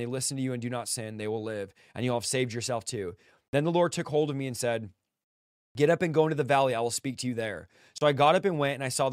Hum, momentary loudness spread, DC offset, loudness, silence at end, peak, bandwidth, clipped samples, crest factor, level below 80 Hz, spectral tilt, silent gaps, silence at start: none; 12 LU; under 0.1%; -28 LUFS; 0 s; -10 dBFS; 16 kHz; under 0.1%; 20 dB; -68 dBFS; -4.5 dB/octave; 3.48-3.53 s, 5.24-5.75 s; 0 s